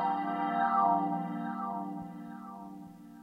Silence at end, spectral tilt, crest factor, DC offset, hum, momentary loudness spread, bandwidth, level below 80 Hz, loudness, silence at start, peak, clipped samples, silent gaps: 0 s; -8 dB/octave; 18 dB; under 0.1%; none; 19 LU; 15 kHz; -74 dBFS; -32 LUFS; 0 s; -16 dBFS; under 0.1%; none